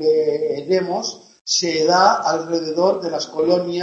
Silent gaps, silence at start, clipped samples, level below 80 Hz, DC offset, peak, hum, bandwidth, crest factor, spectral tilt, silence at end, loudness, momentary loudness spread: 1.41-1.45 s; 0 s; under 0.1%; -64 dBFS; under 0.1%; -2 dBFS; none; 8.2 kHz; 18 dB; -3.5 dB/octave; 0 s; -19 LUFS; 9 LU